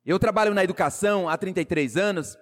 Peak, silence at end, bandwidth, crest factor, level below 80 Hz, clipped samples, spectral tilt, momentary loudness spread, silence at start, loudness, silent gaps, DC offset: -12 dBFS; 0.1 s; 16 kHz; 12 dB; -52 dBFS; under 0.1%; -5 dB/octave; 5 LU; 0.05 s; -23 LUFS; none; under 0.1%